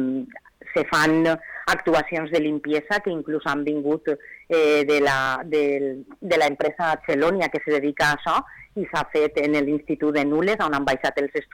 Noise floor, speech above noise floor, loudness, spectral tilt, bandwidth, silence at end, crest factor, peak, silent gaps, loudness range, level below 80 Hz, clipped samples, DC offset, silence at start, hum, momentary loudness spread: -42 dBFS; 20 dB; -22 LUFS; -5 dB/octave; 18 kHz; 0.1 s; 10 dB; -14 dBFS; none; 1 LU; -54 dBFS; under 0.1%; under 0.1%; 0 s; none; 8 LU